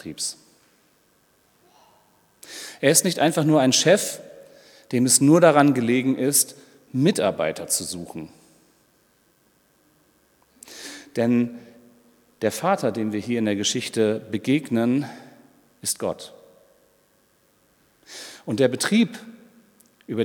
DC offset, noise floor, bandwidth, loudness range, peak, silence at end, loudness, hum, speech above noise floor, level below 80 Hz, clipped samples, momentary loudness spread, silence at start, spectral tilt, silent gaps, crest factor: under 0.1%; -62 dBFS; 18.5 kHz; 12 LU; 0 dBFS; 0 s; -21 LUFS; none; 41 dB; -70 dBFS; under 0.1%; 21 LU; 0.05 s; -4 dB/octave; none; 24 dB